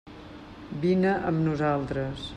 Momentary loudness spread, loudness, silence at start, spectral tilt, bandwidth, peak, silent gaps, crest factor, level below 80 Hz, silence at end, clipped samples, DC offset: 20 LU; -26 LUFS; 0.05 s; -8 dB/octave; 9.4 kHz; -14 dBFS; none; 14 dB; -50 dBFS; 0 s; under 0.1%; under 0.1%